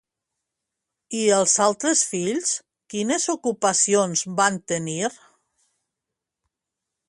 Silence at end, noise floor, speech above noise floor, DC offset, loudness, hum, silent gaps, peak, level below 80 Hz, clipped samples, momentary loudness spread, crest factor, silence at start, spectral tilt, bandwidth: 1.95 s; -85 dBFS; 63 dB; under 0.1%; -21 LUFS; none; none; -4 dBFS; -70 dBFS; under 0.1%; 10 LU; 20 dB; 1.1 s; -2.5 dB/octave; 11.5 kHz